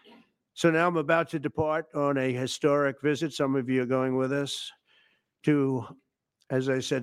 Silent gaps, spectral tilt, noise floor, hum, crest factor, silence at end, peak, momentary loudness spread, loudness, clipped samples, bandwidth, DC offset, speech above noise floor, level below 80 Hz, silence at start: none; -5.5 dB/octave; -67 dBFS; none; 18 dB; 0 s; -10 dBFS; 8 LU; -27 LUFS; under 0.1%; 15 kHz; under 0.1%; 40 dB; -66 dBFS; 0.55 s